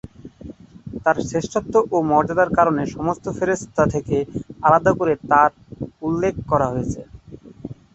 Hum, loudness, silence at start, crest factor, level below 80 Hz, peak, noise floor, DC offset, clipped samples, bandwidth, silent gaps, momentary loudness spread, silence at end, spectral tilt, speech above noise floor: none; -20 LUFS; 0.25 s; 18 dB; -44 dBFS; -2 dBFS; -41 dBFS; under 0.1%; under 0.1%; 8.2 kHz; none; 21 LU; 0.2 s; -7 dB/octave; 22 dB